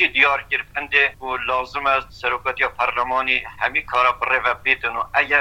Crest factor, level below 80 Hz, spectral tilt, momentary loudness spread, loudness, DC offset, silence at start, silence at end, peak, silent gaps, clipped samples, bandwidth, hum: 20 dB; -48 dBFS; -3.5 dB/octave; 6 LU; -19 LUFS; under 0.1%; 0 s; 0 s; -2 dBFS; none; under 0.1%; 17 kHz; none